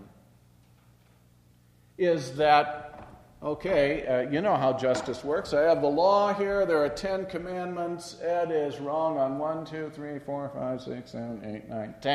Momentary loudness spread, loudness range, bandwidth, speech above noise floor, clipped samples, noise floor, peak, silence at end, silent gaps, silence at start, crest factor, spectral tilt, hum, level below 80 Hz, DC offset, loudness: 15 LU; 6 LU; 12.5 kHz; 33 dB; under 0.1%; -60 dBFS; -6 dBFS; 0 s; none; 0 s; 22 dB; -5.5 dB/octave; 60 Hz at -60 dBFS; -58 dBFS; under 0.1%; -28 LUFS